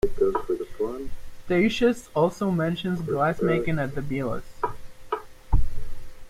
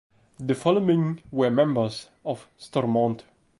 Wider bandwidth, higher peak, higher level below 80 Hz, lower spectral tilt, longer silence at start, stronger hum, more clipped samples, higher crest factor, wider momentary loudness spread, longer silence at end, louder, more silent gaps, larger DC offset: first, 13.5 kHz vs 11.5 kHz; about the same, -8 dBFS vs -8 dBFS; first, -34 dBFS vs -64 dBFS; about the same, -7 dB/octave vs -7.5 dB/octave; second, 0.05 s vs 0.4 s; neither; neither; about the same, 16 dB vs 16 dB; about the same, 11 LU vs 13 LU; second, 0 s vs 0.4 s; about the same, -26 LUFS vs -25 LUFS; neither; neither